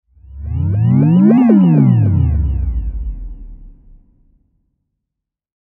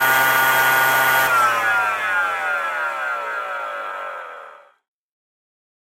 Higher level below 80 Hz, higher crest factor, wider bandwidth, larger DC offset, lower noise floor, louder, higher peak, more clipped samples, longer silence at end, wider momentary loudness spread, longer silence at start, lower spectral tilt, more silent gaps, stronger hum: first, -24 dBFS vs -62 dBFS; about the same, 14 dB vs 16 dB; second, 3.1 kHz vs 16.5 kHz; neither; first, -81 dBFS vs -42 dBFS; first, -12 LUFS vs -18 LUFS; first, 0 dBFS vs -4 dBFS; neither; first, 1.95 s vs 1.45 s; first, 19 LU vs 14 LU; first, 0.3 s vs 0 s; first, -13 dB/octave vs -1 dB/octave; neither; neither